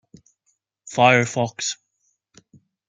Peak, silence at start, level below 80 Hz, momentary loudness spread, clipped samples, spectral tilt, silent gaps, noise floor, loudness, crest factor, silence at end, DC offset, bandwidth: -2 dBFS; 0.85 s; -66 dBFS; 14 LU; under 0.1%; -4 dB/octave; none; -71 dBFS; -19 LUFS; 22 dB; 1.15 s; under 0.1%; 9.6 kHz